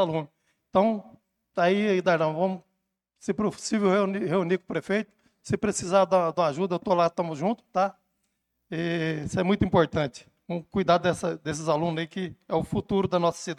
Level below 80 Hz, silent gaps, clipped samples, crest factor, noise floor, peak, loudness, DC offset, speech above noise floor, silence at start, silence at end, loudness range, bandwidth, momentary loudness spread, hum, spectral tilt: -56 dBFS; none; under 0.1%; 18 dB; -79 dBFS; -8 dBFS; -26 LUFS; under 0.1%; 53 dB; 0 s; 0.05 s; 2 LU; 12 kHz; 10 LU; none; -6 dB/octave